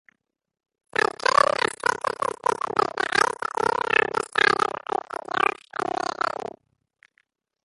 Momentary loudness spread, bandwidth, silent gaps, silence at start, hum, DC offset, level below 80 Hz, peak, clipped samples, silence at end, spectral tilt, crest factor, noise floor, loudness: 10 LU; 11.5 kHz; none; 1.25 s; none; under 0.1%; -62 dBFS; -4 dBFS; under 0.1%; 1.15 s; -2 dB/octave; 22 dB; -81 dBFS; -24 LUFS